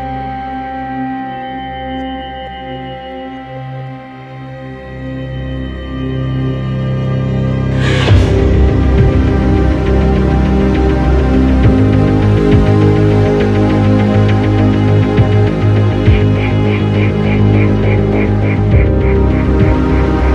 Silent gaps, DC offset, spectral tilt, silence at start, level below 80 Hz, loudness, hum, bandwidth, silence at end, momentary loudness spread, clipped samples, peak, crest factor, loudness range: none; under 0.1%; -8.5 dB/octave; 0 s; -18 dBFS; -12 LUFS; none; 7.6 kHz; 0 s; 15 LU; under 0.1%; 0 dBFS; 10 dB; 14 LU